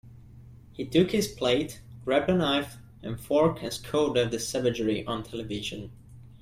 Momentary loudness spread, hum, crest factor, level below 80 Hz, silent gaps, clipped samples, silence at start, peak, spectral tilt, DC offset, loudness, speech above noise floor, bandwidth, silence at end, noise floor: 15 LU; none; 18 dB; -54 dBFS; none; under 0.1%; 0.05 s; -10 dBFS; -5 dB/octave; under 0.1%; -27 LUFS; 22 dB; 16 kHz; 0.05 s; -49 dBFS